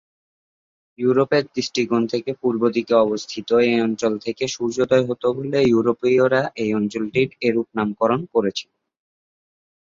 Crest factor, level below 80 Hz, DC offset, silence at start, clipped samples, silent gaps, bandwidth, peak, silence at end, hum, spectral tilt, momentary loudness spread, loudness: 18 dB; -60 dBFS; under 0.1%; 1 s; under 0.1%; none; 7.6 kHz; -4 dBFS; 1.3 s; none; -5.5 dB/octave; 7 LU; -20 LUFS